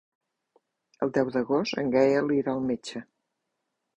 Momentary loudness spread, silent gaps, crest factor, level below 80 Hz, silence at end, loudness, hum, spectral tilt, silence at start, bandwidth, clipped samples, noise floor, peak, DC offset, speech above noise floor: 11 LU; none; 20 dB; -66 dBFS; 0.95 s; -26 LUFS; none; -6 dB/octave; 1 s; 10 kHz; under 0.1%; -81 dBFS; -10 dBFS; under 0.1%; 56 dB